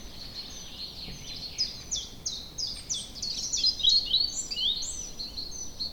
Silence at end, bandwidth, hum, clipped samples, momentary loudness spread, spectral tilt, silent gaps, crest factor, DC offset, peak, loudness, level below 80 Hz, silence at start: 0 s; 19 kHz; none; under 0.1%; 16 LU; 0 dB/octave; none; 20 dB; under 0.1%; -12 dBFS; -28 LUFS; -50 dBFS; 0 s